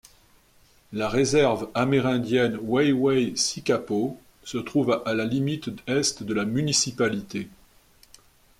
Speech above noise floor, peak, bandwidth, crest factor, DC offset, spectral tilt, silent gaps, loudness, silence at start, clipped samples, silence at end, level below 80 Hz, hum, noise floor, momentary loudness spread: 34 dB; -8 dBFS; 16 kHz; 16 dB; under 0.1%; -4.5 dB/octave; none; -24 LUFS; 0.9 s; under 0.1%; 1.1 s; -58 dBFS; none; -58 dBFS; 11 LU